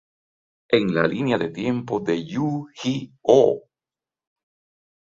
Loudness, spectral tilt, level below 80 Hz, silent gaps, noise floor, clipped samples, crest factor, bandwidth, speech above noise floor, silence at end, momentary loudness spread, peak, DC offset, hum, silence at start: -22 LUFS; -6.5 dB/octave; -62 dBFS; none; under -90 dBFS; under 0.1%; 22 dB; 7.6 kHz; over 69 dB; 1.45 s; 10 LU; -2 dBFS; under 0.1%; none; 0.7 s